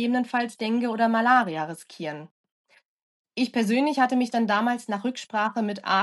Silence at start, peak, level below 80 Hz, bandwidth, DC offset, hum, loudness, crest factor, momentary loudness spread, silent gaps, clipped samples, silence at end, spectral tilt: 0 s; -8 dBFS; -82 dBFS; 12 kHz; under 0.1%; none; -25 LUFS; 18 dB; 14 LU; 2.31-2.44 s, 2.52-2.64 s, 2.85-3.25 s; under 0.1%; 0 s; -5 dB/octave